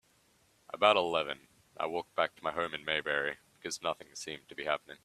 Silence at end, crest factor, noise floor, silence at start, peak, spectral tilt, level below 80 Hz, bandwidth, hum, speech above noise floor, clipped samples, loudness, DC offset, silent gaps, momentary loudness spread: 0.1 s; 26 dB; -69 dBFS; 0.75 s; -8 dBFS; -2.5 dB/octave; -72 dBFS; 14 kHz; none; 35 dB; under 0.1%; -33 LUFS; under 0.1%; none; 15 LU